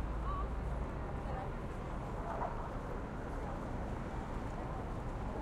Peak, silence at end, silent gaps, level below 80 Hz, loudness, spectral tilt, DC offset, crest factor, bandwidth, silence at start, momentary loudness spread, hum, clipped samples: -26 dBFS; 0 s; none; -44 dBFS; -42 LUFS; -7.5 dB/octave; under 0.1%; 14 dB; 11.5 kHz; 0 s; 3 LU; none; under 0.1%